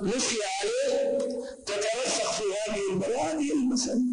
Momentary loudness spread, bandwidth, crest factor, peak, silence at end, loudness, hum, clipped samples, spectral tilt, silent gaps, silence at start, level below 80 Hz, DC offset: 4 LU; 10 kHz; 12 dB; -16 dBFS; 0 s; -28 LUFS; none; under 0.1%; -3 dB/octave; none; 0 s; -60 dBFS; under 0.1%